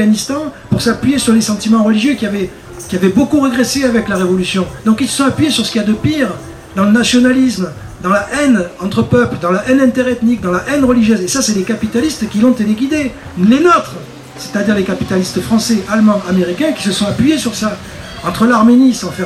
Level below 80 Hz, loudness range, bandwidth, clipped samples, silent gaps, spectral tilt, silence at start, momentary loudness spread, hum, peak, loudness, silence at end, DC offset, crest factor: -40 dBFS; 1 LU; 14.5 kHz; under 0.1%; none; -5 dB/octave; 0 s; 11 LU; none; 0 dBFS; -13 LUFS; 0 s; under 0.1%; 12 dB